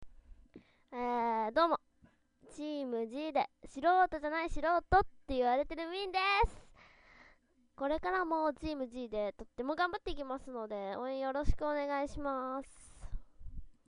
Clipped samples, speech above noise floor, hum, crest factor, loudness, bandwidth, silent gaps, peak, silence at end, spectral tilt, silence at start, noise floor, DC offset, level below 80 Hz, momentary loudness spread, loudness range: under 0.1%; 34 dB; none; 20 dB; -35 LUFS; 10.5 kHz; none; -16 dBFS; 0.15 s; -5.5 dB/octave; 0 s; -68 dBFS; under 0.1%; -48 dBFS; 14 LU; 6 LU